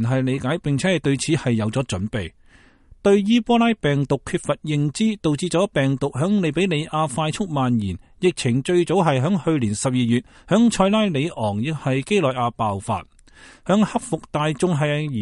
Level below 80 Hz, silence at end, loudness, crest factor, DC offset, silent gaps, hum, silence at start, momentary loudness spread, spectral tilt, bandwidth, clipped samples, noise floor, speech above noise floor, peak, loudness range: -48 dBFS; 0 s; -21 LUFS; 18 dB; under 0.1%; none; none; 0 s; 7 LU; -6 dB/octave; 11.5 kHz; under 0.1%; -52 dBFS; 31 dB; -4 dBFS; 3 LU